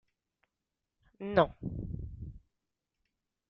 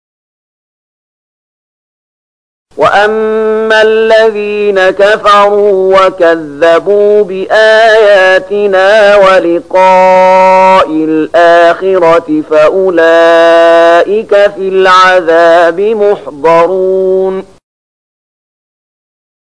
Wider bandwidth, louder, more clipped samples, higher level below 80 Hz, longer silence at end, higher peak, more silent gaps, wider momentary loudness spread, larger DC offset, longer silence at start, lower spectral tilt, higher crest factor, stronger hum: second, 6 kHz vs 10.5 kHz; second, -33 LUFS vs -6 LUFS; second, under 0.1% vs 0.5%; second, -52 dBFS vs -46 dBFS; second, 1.1 s vs 2.1 s; second, -12 dBFS vs 0 dBFS; neither; first, 19 LU vs 6 LU; second, under 0.1% vs 0.8%; second, 1.2 s vs 2.75 s; first, -9 dB/octave vs -4.5 dB/octave; first, 26 dB vs 6 dB; neither